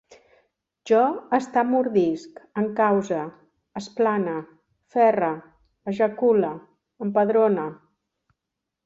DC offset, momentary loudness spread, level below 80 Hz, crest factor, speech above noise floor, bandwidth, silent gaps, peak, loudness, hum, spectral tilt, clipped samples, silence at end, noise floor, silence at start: under 0.1%; 15 LU; -68 dBFS; 18 dB; 62 dB; 7.8 kHz; none; -6 dBFS; -23 LUFS; none; -7 dB/octave; under 0.1%; 1.1 s; -84 dBFS; 0.85 s